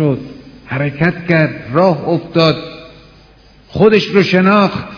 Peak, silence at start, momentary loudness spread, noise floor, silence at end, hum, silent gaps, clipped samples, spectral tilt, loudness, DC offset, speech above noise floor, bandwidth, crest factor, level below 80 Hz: 0 dBFS; 0 s; 13 LU; -44 dBFS; 0 s; none; none; 0.3%; -7.5 dB/octave; -13 LUFS; under 0.1%; 31 dB; 5.4 kHz; 14 dB; -46 dBFS